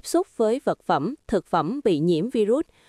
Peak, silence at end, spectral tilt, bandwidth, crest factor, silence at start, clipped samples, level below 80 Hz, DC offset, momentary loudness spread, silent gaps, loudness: -8 dBFS; 0.25 s; -6.5 dB/octave; 15 kHz; 16 dB; 0.05 s; under 0.1%; -56 dBFS; under 0.1%; 3 LU; none; -24 LUFS